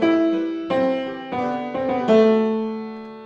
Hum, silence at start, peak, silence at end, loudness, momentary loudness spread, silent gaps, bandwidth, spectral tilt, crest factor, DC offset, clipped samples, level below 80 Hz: none; 0 s; -4 dBFS; 0 s; -21 LUFS; 12 LU; none; 7.2 kHz; -7 dB/octave; 16 dB; under 0.1%; under 0.1%; -62 dBFS